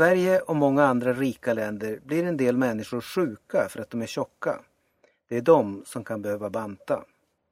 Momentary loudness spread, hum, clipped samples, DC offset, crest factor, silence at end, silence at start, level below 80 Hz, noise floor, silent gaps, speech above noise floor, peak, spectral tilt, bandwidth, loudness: 12 LU; none; under 0.1%; under 0.1%; 20 dB; 0.5 s; 0 s; -66 dBFS; -66 dBFS; none; 41 dB; -4 dBFS; -6.5 dB/octave; 16 kHz; -26 LUFS